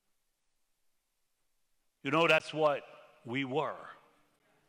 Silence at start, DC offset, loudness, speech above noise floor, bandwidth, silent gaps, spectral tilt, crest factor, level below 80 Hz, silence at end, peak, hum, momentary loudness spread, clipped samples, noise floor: 2.05 s; under 0.1%; -31 LUFS; 47 dB; 16.5 kHz; none; -5 dB/octave; 24 dB; -84 dBFS; 0.75 s; -12 dBFS; none; 16 LU; under 0.1%; -78 dBFS